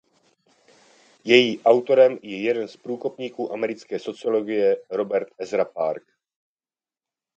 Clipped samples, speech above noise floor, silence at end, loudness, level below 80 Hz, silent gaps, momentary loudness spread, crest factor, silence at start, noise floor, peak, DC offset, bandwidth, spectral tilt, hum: under 0.1%; over 68 dB; 1.4 s; -22 LUFS; -74 dBFS; none; 14 LU; 22 dB; 1.25 s; under -90 dBFS; 0 dBFS; under 0.1%; 8.2 kHz; -5 dB/octave; none